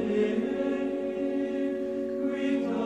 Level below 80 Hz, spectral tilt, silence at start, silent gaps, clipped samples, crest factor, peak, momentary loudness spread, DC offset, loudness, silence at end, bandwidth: -64 dBFS; -7 dB/octave; 0 s; none; under 0.1%; 14 dB; -16 dBFS; 4 LU; under 0.1%; -29 LUFS; 0 s; 8.6 kHz